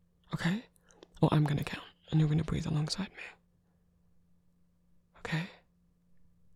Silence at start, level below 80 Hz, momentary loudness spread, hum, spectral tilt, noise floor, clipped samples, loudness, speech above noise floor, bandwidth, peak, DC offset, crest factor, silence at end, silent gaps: 0.3 s; -56 dBFS; 16 LU; none; -6.5 dB/octave; -70 dBFS; under 0.1%; -33 LUFS; 39 dB; 12 kHz; -12 dBFS; under 0.1%; 24 dB; 1.05 s; none